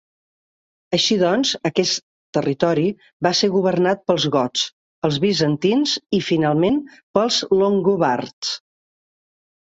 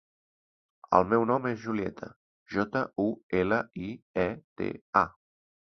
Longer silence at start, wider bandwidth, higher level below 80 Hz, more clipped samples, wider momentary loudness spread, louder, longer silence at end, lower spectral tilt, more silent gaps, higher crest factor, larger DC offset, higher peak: about the same, 0.9 s vs 0.9 s; first, 8 kHz vs 6.4 kHz; about the same, -58 dBFS vs -58 dBFS; neither; second, 7 LU vs 11 LU; first, -19 LUFS vs -29 LUFS; first, 1.15 s vs 0.55 s; second, -4.5 dB/octave vs -8 dB/octave; first, 2.03-2.33 s, 3.13-3.20 s, 4.73-5.02 s, 7.03-7.14 s, 8.33-8.42 s vs 2.16-2.46 s, 3.23-3.30 s, 4.02-4.14 s, 4.44-4.56 s, 4.81-4.93 s; second, 18 dB vs 24 dB; neither; first, -2 dBFS vs -6 dBFS